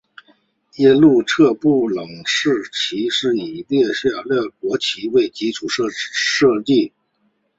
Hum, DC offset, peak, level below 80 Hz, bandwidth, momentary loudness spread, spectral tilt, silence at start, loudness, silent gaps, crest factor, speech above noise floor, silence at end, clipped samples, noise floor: none; under 0.1%; -2 dBFS; -58 dBFS; 8 kHz; 8 LU; -4.5 dB/octave; 0.8 s; -17 LUFS; none; 16 dB; 48 dB; 0.7 s; under 0.1%; -65 dBFS